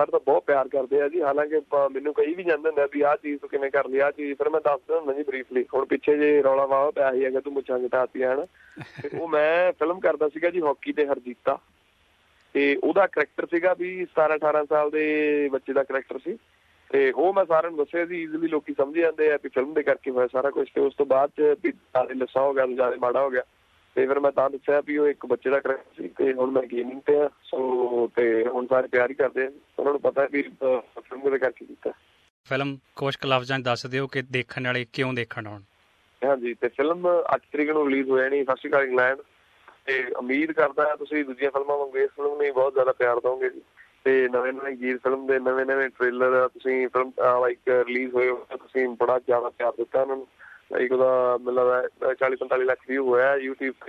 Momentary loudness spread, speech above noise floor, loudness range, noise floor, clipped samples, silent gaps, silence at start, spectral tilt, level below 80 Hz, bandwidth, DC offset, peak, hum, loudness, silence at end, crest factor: 8 LU; 39 dB; 3 LU; -63 dBFS; under 0.1%; 32.30-32.44 s; 0 s; -6.5 dB/octave; -70 dBFS; 7.2 kHz; under 0.1%; -6 dBFS; none; -24 LUFS; 0 s; 18 dB